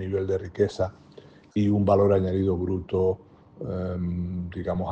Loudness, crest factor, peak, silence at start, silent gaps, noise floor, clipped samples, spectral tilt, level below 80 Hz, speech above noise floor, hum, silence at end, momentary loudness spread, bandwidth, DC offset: -26 LUFS; 18 dB; -8 dBFS; 0 s; none; -50 dBFS; under 0.1%; -9 dB/octave; -54 dBFS; 25 dB; none; 0 s; 12 LU; 8.2 kHz; under 0.1%